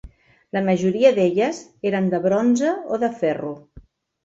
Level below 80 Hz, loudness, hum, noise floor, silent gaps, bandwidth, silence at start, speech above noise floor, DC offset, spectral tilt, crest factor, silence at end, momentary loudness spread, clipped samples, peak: -54 dBFS; -20 LUFS; none; -48 dBFS; none; 8 kHz; 0.05 s; 29 dB; under 0.1%; -6.5 dB/octave; 18 dB; 0.45 s; 12 LU; under 0.1%; -2 dBFS